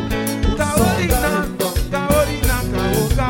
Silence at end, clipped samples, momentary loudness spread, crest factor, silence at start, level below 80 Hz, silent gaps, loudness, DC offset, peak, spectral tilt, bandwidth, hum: 0 s; under 0.1%; 5 LU; 14 dB; 0 s; -24 dBFS; none; -18 LUFS; under 0.1%; -4 dBFS; -5 dB/octave; 17 kHz; none